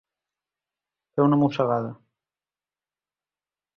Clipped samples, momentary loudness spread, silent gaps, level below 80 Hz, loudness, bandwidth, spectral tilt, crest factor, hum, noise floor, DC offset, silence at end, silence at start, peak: under 0.1%; 13 LU; none; -68 dBFS; -23 LUFS; 6.6 kHz; -9.5 dB/octave; 20 dB; none; under -90 dBFS; under 0.1%; 1.85 s; 1.15 s; -8 dBFS